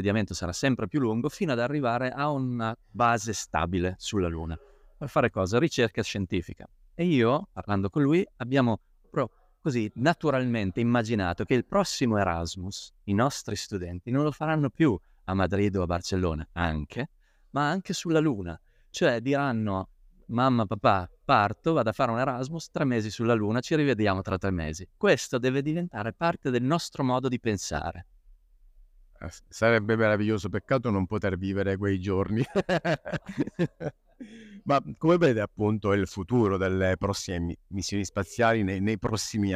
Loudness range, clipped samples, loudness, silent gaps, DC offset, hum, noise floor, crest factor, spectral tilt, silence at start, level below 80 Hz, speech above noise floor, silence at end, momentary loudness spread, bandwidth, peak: 3 LU; under 0.1%; -27 LUFS; none; under 0.1%; none; -56 dBFS; 20 dB; -6 dB/octave; 0 s; -50 dBFS; 30 dB; 0 s; 10 LU; 15.5 kHz; -6 dBFS